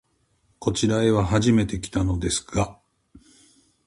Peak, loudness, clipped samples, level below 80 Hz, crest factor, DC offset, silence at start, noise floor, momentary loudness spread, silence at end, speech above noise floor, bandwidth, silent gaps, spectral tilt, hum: -6 dBFS; -23 LUFS; under 0.1%; -40 dBFS; 18 dB; under 0.1%; 0.6 s; -66 dBFS; 7 LU; 0.7 s; 44 dB; 11.5 kHz; none; -5.5 dB/octave; none